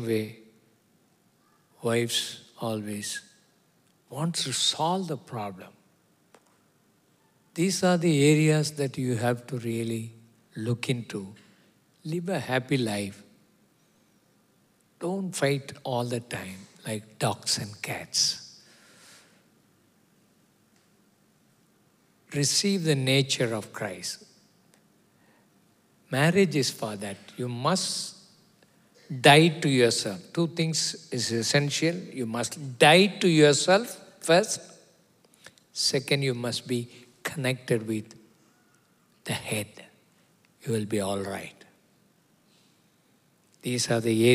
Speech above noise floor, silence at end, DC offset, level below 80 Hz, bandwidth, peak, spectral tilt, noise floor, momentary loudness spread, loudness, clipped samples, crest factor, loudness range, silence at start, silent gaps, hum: 39 dB; 0 s; under 0.1%; -76 dBFS; 16 kHz; -2 dBFS; -4 dB/octave; -65 dBFS; 17 LU; -26 LUFS; under 0.1%; 26 dB; 11 LU; 0 s; none; none